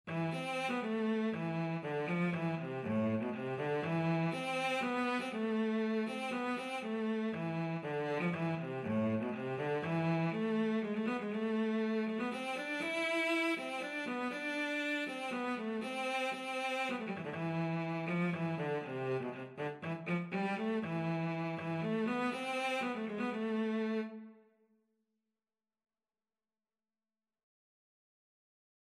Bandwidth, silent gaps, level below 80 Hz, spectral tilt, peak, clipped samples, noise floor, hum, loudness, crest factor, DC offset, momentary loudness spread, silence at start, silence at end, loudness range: 13 kHz; none; -84 dBFS; -6.5 dB/octave; -22 dBFS; under 0.1%; under -90 dBFS; none; -36 LUFS; 14 dB; under 0.1%; 4 LU; 0.05 s; 4.55 s; 3 LU